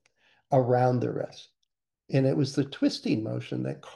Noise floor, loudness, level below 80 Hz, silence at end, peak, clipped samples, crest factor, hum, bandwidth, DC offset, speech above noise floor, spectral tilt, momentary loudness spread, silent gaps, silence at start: -81 dBFS; -27 LUFS; -70 dBFS; 0 s; -10 dBFS; under 0.1%; 18 dB; none; 11 kHz; under 0.1%; 55 dB; -7 dB/octave; 10 LU; none; 0.5 s